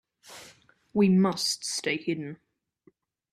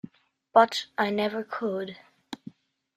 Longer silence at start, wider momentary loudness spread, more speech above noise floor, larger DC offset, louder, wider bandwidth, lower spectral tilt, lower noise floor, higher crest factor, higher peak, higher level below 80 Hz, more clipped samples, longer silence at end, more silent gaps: second, 0.3 s vs 0.55 s; first, 24 LU vs 21 LU; first, 39 dB vs 24 dB; neither; about the same, -26 LUFS vs -26 LUFS; about the same, 14 kHz vs 14 kHz; about the same, -4.5 dB/octave vs -4.5 dB/octave; first, -64 dBFS vs -49 dBFS; second, 18 dB vs 24 dB; second, -12 dBFS vs -4 dBFS; about the same, -70 dBFS vs -74 dBFS; neither; first, 0.95 s vs 0.6 s; neither